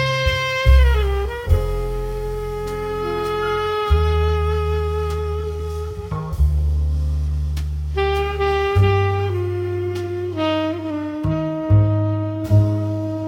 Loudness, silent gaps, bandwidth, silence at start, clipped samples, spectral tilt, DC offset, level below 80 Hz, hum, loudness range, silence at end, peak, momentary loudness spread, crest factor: -21 LUFS; none; 16 kHz; 0 s; under 0.1%; -7 dB/octave; under 0.1%; -24 dBFS; none; 2 LU; 0 s; -2 dBFS; 9 LU; 16 dB